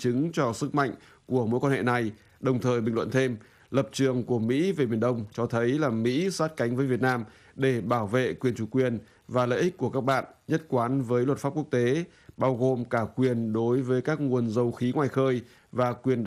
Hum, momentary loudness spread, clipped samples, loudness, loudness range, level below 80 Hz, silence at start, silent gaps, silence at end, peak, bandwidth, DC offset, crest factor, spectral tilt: none; 5 LU; under 0.1%; -27 LUFS; 1 LU; -64 dBFS; 0 s; none; 0 s; -10 dBFS; 14 kHz; under 0.1%; 16 dB; -7 dB/octave